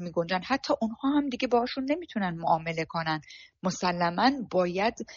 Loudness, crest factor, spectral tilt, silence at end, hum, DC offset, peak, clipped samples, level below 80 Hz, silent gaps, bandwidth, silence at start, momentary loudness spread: -28 LUFS; 20 dB; -4 dB/octave; 0 s; none; under 0.1%; -10 dBFS; under 0.1%; -62 dBFS; none; 7.2 kHz; 0 s; 7 LU